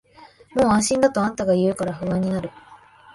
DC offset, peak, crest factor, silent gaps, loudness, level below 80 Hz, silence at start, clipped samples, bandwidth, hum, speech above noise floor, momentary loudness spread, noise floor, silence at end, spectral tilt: under 0.1%; -4 dBFS; 18 dB; none; -21 LUFS; -50 dBFS; 0.2 s; under 0.1%; 11.5 kHz; none; 29 dB; 10 LU; -49 dBFS; 0.4 s; -5.5 dB/octave